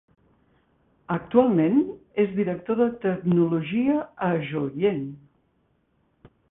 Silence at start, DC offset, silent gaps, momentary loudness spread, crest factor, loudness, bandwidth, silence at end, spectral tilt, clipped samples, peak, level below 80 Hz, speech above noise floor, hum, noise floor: 1.1 s; under 0.1%; none; 9 LU; 20 dB; -24 LUFS; 3.9 kHz; 1.35 s; -12 dB/octave; under 0.1%; -4 dBFS; -62 dBFS; 45 dB; none; -68 dBFS